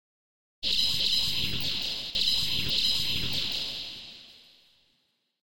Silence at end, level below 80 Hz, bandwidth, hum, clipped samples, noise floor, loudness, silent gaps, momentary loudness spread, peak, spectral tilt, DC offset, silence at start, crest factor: 0 s; -50 dBFS; 16 kHz; none; under 0.1%; -73 dBFS; -26 LUFS; none; 12 LU; -12 dBFS; -1.5 dB/octave; 2%; 0.6 s; 18 dB